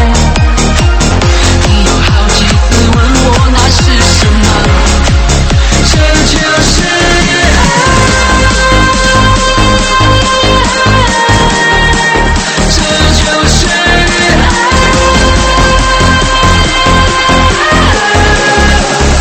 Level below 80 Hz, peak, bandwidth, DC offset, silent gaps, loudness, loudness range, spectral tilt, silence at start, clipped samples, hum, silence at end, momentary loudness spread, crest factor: -12 dBFS; 0 dBFS; 13 kHz; under 0.1%; none; -7 LUFS; 1 LU; -4 dB/octave; 0 s; 2%; none; 0 s; 2 LU; 6 dB